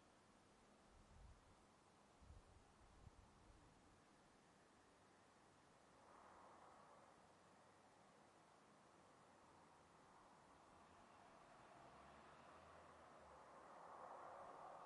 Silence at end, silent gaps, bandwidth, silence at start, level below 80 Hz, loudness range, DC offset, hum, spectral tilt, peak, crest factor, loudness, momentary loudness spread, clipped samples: 0 s; none; 11 kHz; 0 s; -80 dBFS; 6 LU; under 0.1%; none; -4.5 dB/octave; -46 dBFS; 20 dB; -65 LUFS; 10 LU; under 0.1%